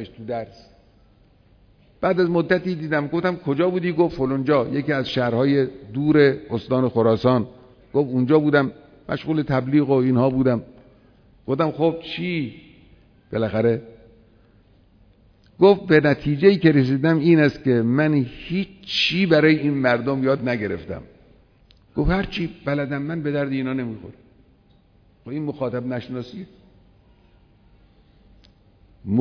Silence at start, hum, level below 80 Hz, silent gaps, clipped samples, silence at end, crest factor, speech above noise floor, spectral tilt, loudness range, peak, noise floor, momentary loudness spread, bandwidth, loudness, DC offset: 0 s; none; -46 dBFS; none; under 0.1%; 0 s; 20 dB; 36 dB; -8 dB/octave; 12 LU; -2 dBFS; -56 dBFS; 14 LU; 5.4 kHz; -21 LUFS; under 0.1%